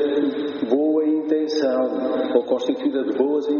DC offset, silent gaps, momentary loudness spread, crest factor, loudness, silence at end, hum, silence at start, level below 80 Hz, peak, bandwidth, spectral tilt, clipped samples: under 0.1%; none; 3 LU; 16 dB; -21 LUFS; 0 s; none; 0 s; -72 dBFS; -4 dBFS; 6.8 kHz; -4 dB/octave; under 0.1%